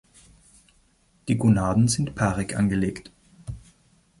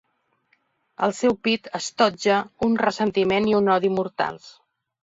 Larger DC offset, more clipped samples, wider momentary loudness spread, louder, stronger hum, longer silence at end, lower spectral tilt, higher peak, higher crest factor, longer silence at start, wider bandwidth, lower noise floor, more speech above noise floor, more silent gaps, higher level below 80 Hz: neither; neither; first, 21 LU vs 8 LU; about the same, -23 LUFS vs -22 LUFS; neither; about the same, 0.6 s vs 0.55 s; first, -6 dB/octave vs -4.5 dB/octave; second, -8 dBFS vs -4 dBFS; about the same, 18 dB vs 18 dB; first, 1.25 s vs 1 s; first, 11.5 kHz vs 8 kHz; second, -62 dBFS vs -67 dBFS; second, 40 dB vs 46 dB; neither; first, -46 dBFS vs -60 dBFS